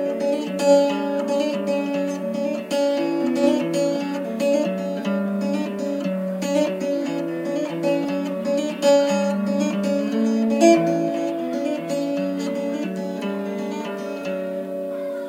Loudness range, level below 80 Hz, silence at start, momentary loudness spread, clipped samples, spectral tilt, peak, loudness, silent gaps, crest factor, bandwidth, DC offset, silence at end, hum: 6 LU; -76 dBFS; 0 s; 10 LU; under 0.1%; -5.5 dB/octave; -2 dBFS; -22 LUFS; none; 20 dB; 16 kHz; under 0.1%; 0 s; none